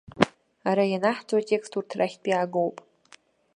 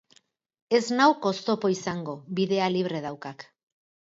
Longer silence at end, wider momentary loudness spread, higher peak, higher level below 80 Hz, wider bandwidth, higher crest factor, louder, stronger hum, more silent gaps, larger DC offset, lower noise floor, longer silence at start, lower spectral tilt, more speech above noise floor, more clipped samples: about the same, 0.8 s vs 0.7 s; second, 6 LU vs 15 LU; first, 0 dBFS vs -8 dBFS; first, -64 dBFS vs -72 dBFS; first, 11 kHz vs 7.8 kHz; first, 26 dB vs 20 dB; about the same, -26 LUFS vs -26 LUFS; neither; neither; neither; second, -57 dBFS vs -63 dBFS; second, 0.15 s vs 0.7 s; about the same, -5.5 dB/octave vs -5 dB/octave; second, 31 dB vs 38 dB; neither